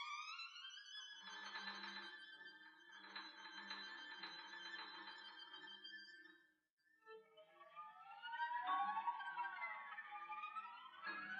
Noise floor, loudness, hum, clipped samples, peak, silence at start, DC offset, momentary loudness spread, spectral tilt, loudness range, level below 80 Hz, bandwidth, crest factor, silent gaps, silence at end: -81 dBFS; -50 LUFS; none; under 0.1%; -32 dBFS; 0 s; under 0.1%; 16 LU; -1 dB/octave; 9 LU; under -90 dBFS; 9.6 kHz; 20 dB; 6.72-6.77 s; 0 s